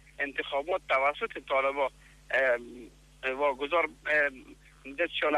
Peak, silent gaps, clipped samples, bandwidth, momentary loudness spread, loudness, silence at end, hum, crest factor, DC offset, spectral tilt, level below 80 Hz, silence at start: -16 dBFS; none; under 0.1%; 12.5 kHz; 9 LU; -29 LUFS; 0 s; none; 16 dB; under 0.1%; -3.5 dB/octave; -60 dBFS; 0.2 s